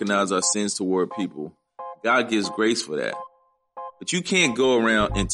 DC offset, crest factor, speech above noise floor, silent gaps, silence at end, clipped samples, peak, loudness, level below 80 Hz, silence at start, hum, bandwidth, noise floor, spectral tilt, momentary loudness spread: under 0.1%; 18 dB; 38 dB; none; 0 s; under 0.1%; -6 dBFS; -22 LUFS; -44 dBFS; 0 s; none; 11.5 kHz; -60 dBFS; -3 dB/octave; 18 LU